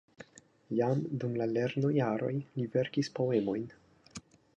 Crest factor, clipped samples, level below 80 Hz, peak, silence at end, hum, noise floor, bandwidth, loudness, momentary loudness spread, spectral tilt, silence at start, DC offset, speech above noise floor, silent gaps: 16 dB; under 0.1%; -72 dBFS; -16 dBFS; 0.35 s; none; -55 dBFS; 10 kHz; -32 LUFS; 20 LU; -7.5 dB/octave; 0.2 s; under 0.1%; 24 dB; none